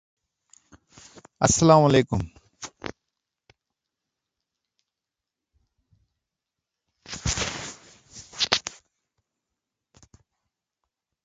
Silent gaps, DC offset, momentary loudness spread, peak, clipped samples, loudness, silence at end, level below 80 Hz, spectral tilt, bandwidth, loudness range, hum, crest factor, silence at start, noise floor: none; under 0.1%; 25 LU; 0 dBFS; under 0.1%; -22 LUFS; 2.55 s; -48 dBFS; -4 dB/octave; 9.6 kHz; 20 LU; none; 28 dB; 1.4 s; -88 dBFS